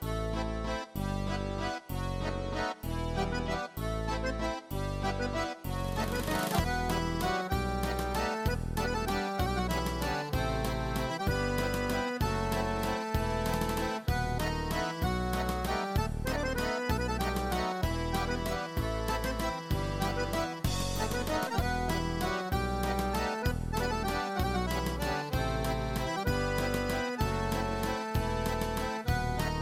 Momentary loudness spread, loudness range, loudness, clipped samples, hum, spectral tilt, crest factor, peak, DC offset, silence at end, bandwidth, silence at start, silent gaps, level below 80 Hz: 4 LU; 2 LU; -33 LUFS; under 0.1%; none; -5 dB/octave; 16 dB; -16 dBFS; under 0.1%; 0 s; 16.5 kHz; 0 s; none; -38 dBFS